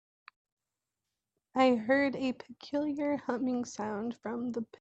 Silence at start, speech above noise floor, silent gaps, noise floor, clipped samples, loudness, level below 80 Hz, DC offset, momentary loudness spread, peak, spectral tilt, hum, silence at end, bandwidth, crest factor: 1.55 s; 57 dB; none; -89 dBFS; under 0.1%; -32 LUFS; -74 dBFS; under 0.1%; 10 LU; -14 dBFS; -5 dB/octave; none; 0.15 s; 8.2 kHz; 20 dB